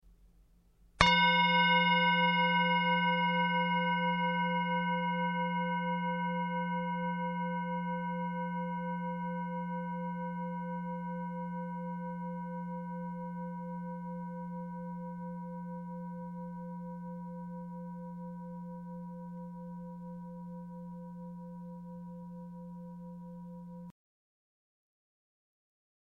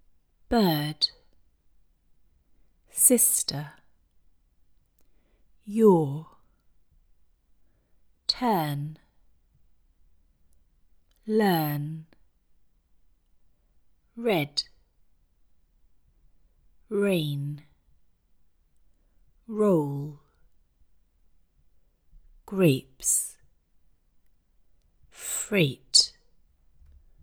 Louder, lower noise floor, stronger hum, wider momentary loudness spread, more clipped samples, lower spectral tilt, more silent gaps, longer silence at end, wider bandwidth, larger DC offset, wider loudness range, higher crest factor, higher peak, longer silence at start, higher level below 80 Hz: second, -33 LUFS vs -25 LUFS; about the same, -64 dBFS vs -63 dBFS; neither; about the same, 20 LU vs 18 LU; neither; first, -6 dB/octave vs -3.5 dB/octave; neither; first, 2.1 s vs 1.15 s; second, 9 kHz vs over 20 kHz; neither; first, 19 LU vs 8 LU; about the same, 28 dB vs 26 dB; about the same, -6 dBFS vs -4 dBFS; second, 0.05 s vs 0.5 s; about the same, -60 dBFS vs -60 dBFS